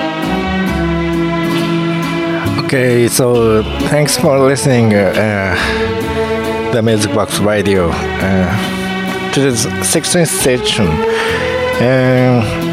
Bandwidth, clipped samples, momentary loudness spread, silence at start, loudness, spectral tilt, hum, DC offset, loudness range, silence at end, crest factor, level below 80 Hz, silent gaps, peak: 16.5 kHz; under 0.1%; 6 LU; 0 s; -13 LUFS; -5 dB/octave; none; under 0.1%; 3 LU; 0 s; 12 dB; -32 dBFS; none; 0 dBFS